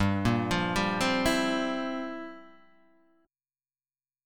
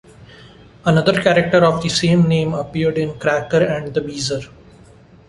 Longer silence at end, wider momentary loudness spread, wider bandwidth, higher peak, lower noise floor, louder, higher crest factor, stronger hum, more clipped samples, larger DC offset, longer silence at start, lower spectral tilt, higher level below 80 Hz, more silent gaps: first, 1.8 s vs 0.8 s; first, 12 LU vs 9 LU; first, 17.5 kHz vs 11.5 kHz; second, -12 dBFS vs -2 dBFS; first, under -90 dBFS vs -45 dBFS; second, -28 LUFS vs -17 LUFS; about the same, 18 dB vs 16 dB; neither; neither; neither; second, 0 s vs 0.2 s; about the same, -5 dB/octave vs -5.5 dB/octave; about the same, -50 dBFS vs -46 dBFS; neither